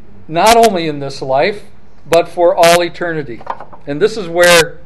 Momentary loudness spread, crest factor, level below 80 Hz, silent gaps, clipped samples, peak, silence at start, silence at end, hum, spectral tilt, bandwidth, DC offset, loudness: 17 LU; 14 dB; -42 dBFS; none; 0.3%; 0 dBFS; 0.3 s; 0.15 s; none; -3.5 dB/octave; 17.5 kHz; 4%; -12 LUFS